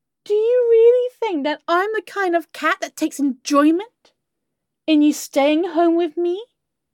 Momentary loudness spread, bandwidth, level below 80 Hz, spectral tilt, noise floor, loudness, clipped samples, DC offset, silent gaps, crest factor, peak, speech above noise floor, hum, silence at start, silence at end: 9 LU; 17 kHz; -78 dBFS; -2.5 dB/octave; -79 dBFS; -18 LUFS; under 0.1%; under 0.1%; none; 14 dB; -4 dBFS; 60 dB; none; 0.3 s; 0.5 s